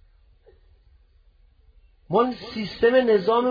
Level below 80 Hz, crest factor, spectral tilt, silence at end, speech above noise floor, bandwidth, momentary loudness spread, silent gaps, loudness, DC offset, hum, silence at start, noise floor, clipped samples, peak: -56 dBFS; 18 dB; -7.5 dB/octave; 0 s; 36 dB; 5.2 kHz; 11 LU; none; -22 LUFS; under 0.1%; none; 2.1 s; -57 dBFS; under 0.1%; -8 dBFS